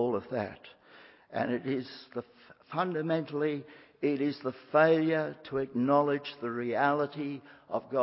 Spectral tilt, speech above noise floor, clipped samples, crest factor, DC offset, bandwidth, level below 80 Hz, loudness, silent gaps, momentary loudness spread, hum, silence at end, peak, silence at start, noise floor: -10 dB/octave; 26 dB; under 0.1%; 20 dB; under 0.1%; 5.8 kHz; -72 dBFS; -31 LUFS; none; 14 LU; none; 0 s; -10 dBFS; 0 s; -56 dBFS